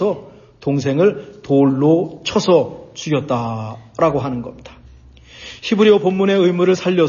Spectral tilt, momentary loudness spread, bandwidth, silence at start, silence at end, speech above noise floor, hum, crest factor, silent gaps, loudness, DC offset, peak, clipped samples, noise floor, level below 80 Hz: -6.5 dB/octave; 15 LU; 7.2 kHz; 0 s; 0 s; 27 dB; none; 16 dB; none; -16 LUFS; under 0.1%; -2 dBFS; under 0.1%; -43 dBFS; -50 dBFS